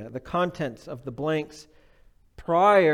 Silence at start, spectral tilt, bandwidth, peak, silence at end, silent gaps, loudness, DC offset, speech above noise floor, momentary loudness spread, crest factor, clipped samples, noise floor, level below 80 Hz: 0 s; -6.5 dB/octave; 12.5 kHz; -6 dBFS; 0 s; none; -25 LUFS; under 0.1%; 33 dB; 20 LU; 18 dB; under 0.1%; -57 dBFS; -56 dBFS